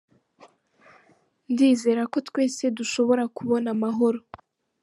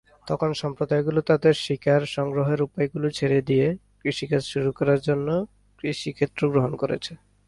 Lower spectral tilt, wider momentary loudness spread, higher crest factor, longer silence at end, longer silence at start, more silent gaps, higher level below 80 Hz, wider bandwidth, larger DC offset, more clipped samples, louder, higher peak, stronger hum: second, -4.5 dB/octave vs -6.5 dB/octave; about the same, 7 LU vs 8 LU; about the same, 16 dB vs 16 dB; first, 0.65 s vs 0.35 s; first, 1.5 s vs 0.25 s; neither; second, -72 dBFS vs -56 dBFS; about the same, 11.5 kHz vs 11.5 kHz; neither; neither; about the same, -24 LUFS vs -24 LUFS; about the same, -8 dBFS vs -6 dBFS; neither